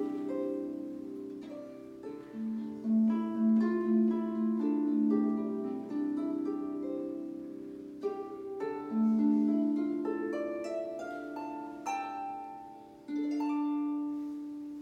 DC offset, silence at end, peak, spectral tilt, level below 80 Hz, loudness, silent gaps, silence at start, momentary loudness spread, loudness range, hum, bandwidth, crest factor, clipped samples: under 0.1%; 0 s; -18 dBFS; -8 dB/octave; -74 dBFS; -33 LUFS; none; 0 s; 15 LU; 7 LU; none; 7.8 kHz; 16 dB; under 0.1%